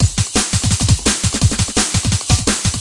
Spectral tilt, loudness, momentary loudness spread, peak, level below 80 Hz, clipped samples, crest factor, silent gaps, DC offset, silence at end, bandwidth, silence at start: -3.5 dB/octave; -15 LUFS; 2 LU; 0 dBFS; -26 dBFS; under 0.1%; 14 dB; none; under 0.1%; 0 s; 11.5 kHz; 0 s